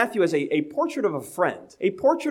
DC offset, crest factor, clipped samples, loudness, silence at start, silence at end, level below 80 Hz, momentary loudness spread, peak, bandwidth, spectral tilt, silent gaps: under 0.1%; 16 dB; under 0.1%; -24 LUFS; 0 s; 0 s; -72 dBFS; 5 LU; -8 dBFS; 16.5 kHz; -5.5 dB/octave; none